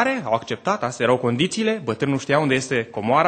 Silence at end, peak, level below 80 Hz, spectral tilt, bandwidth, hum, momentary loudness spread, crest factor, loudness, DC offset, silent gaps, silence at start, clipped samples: 0 s; -4 dBFS; -60 dBFS; -5 dB/octave; 9.2 kHz; none; 4 LU; 18 dB; -21 LUFS; under 0.1%; none; 0 s; under 0.1%